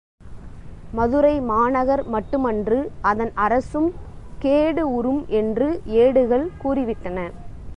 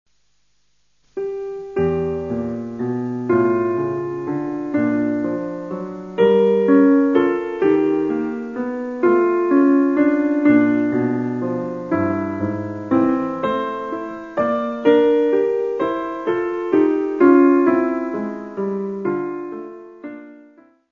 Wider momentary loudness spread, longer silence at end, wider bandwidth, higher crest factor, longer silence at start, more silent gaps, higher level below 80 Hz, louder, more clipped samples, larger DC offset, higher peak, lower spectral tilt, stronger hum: about the same, 11 LU vs 13 LU; second, 0 s vs 0.55 s; first, 9.6 kHz vs 6.6 kHz; about the same, 16 dB vs 18 dB; second, 0.2 s vs 1.15 s; neither; first, -40 dBFS vs -56 dBFS; about the same, -21 LUFS vs -19 LUFS; neither; second, under 0.1% vs 0.1%; second, -6 dBFS vs -2 dBFS; about the same, -8 dB/octave vs -9 dB/octave; neither